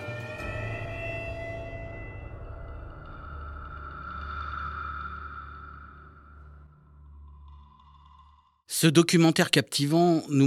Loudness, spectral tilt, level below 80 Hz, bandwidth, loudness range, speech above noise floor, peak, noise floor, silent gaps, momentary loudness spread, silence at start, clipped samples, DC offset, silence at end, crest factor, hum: -27 LUFS; -5 dB/octave; -46 dBFS; 15 kHz; 19 LU; 37 dB; -2 dBFS; -58 dBFS; none; 22 LU; 0 s; under 0.1%; under 0.1%; 0 s; 28 dB; none